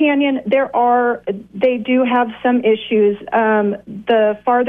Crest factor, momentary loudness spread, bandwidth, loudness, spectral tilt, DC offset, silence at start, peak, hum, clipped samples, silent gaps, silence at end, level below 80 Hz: 12 dB; 4 LU; 3.8 kHz; -16 LUFS; -8.5 dB/octave; under 0.1%; 0 s; -4 dBFS; none; under 0.1%; none; 0 s; -58 dBFS